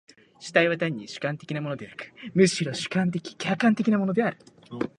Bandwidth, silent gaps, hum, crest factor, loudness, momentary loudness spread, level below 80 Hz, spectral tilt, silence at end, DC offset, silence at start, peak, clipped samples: 11.5 kHz; none; none; 22 dB; -25 LUFS; 13 LU; -66 dBFS; -5.5 dB/octave; 0.1 s; under 0.1%; 0.4 s; -4 dBFS; under 0.1%